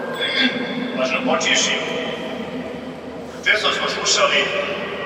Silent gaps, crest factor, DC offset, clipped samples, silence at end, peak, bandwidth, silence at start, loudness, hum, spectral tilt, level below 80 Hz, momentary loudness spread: none; 18 dB; under 0.1%; under 0.1%; 0 s; -2 dBFS; 16 kHz; 0 s; -19 LUFS; none; -2 dB/octave; -56 dBFS; 14 LU